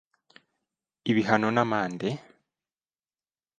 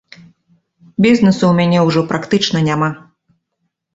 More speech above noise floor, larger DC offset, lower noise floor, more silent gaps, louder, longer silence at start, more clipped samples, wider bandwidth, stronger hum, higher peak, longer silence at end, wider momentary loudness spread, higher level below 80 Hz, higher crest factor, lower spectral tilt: first, over 65 dB vs 59 dB; neither; first, under -90 dBFS vs -71 dBFS; neither; second, -26 LUFS vs -14 LUFS; about the same, 1.05 s vs 1 s; neither; first, 9.2 kHz vs 8 kHz; neither; second, -4 dBFS vs 0 dBFS; first, 1.4 s vs 0.95 s; about the same, 11 LU vs 9 LU; second, -70 dBFS vs -50 dBFS; first, 26 dB vs 16 dB; about the same, -6.5 dB/octave vs -6.5 dB/octave